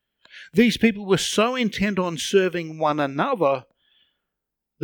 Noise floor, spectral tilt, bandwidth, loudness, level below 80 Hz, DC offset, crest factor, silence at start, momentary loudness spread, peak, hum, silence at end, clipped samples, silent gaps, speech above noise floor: -83 dBFS; -4.5 dB/octave; 19 kHz; -22 LUFS; -54 dBFS; under 0.1%; 18 dB; 0.35 s; 6 LU; -4 dBFS; none; 1.25 s; under 0.1%; none; 62 dB